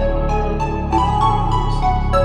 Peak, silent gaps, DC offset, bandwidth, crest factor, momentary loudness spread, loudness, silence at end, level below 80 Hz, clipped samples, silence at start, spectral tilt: -4 dBFS; none; under 0.1%; 9.8 kHz; 14 dB; 4 LU; -18 LUFS; 0 s; -20 dBFS; under 0.1%; 0 s; -7 dB/octave